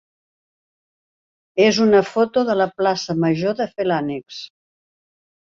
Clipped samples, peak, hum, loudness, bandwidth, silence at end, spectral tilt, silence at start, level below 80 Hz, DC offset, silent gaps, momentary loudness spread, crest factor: under 0.1%; -2 dBFS; none; -19 LUFS; 7.6 kHz; 1.1 s; -5.5 dB/octave; 1.55 s; -62 dBFS; under 0.1%; none; 14 LU; 20 dB